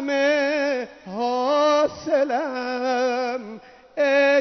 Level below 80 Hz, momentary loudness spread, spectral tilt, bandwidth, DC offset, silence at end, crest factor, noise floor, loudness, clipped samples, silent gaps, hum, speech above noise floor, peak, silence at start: -66 dBFS; 14 LU; -3.5 dB/octave; 6.4 kHz; under 0.1%; 0 s; 14 dB; -41 dBFS; -22 LUFS; under 0.1%; none; none; 17 dB; -8 dBFS; 0 s